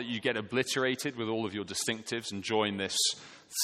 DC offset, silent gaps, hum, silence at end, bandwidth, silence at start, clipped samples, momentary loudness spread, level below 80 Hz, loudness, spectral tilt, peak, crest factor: under 0.1%; none; none; 0 s; 16 kHz; 0 s; under 0.1%; 7 LU; -72 dBFS; -31 LUFS; -2.5 dB/octave; -14 dBFS; 20 dB